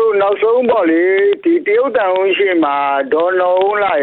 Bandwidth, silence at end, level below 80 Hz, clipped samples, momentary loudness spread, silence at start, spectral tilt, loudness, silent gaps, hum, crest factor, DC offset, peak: 4.3 kHz; 0 s; -60 dBFS; under 0.1%; 2 LU; 0 s; -7.5 dB/octave; -13 LUFS; none; none; 10 dB; under 0.1%; -4 dBFS